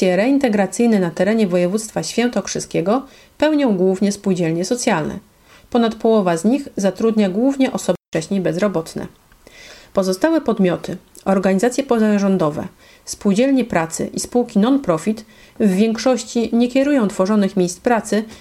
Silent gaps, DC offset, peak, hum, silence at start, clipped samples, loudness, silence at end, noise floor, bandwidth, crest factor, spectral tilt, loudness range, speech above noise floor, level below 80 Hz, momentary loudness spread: 8.08-8.12 s; under 0.1%; 0 dBFS; none; 0 s; under 0.1%; -18 LUFS; 0.05 s; -43 dBFS; 15 kHz; 18 dB; -5.5 dB/octave; 3 LU; 26 dB; -52 dBFS; 7 LU